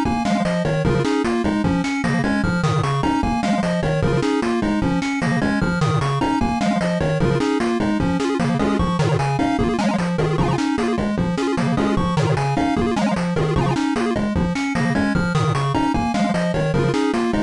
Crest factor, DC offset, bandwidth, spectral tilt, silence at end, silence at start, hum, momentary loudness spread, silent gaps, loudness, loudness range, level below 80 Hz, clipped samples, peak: 10 dB; 0.2%; 11.5 kHz; -6.5 dB/octave; 0 s; 0 s; none; 1 LU; none; -20 LUFS; 0 LU; -36 dBFS; under 0.1%; -8 dBFS